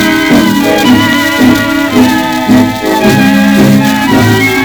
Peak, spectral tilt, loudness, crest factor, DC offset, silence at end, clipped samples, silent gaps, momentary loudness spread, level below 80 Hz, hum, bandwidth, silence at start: 0 dBFS; -5 dB/octave; -7 LUFS; 6 dB; 0.2%; 0 s; 1%; none; 3 LU; -34 dBFS; none; over 20 kHz; 0 s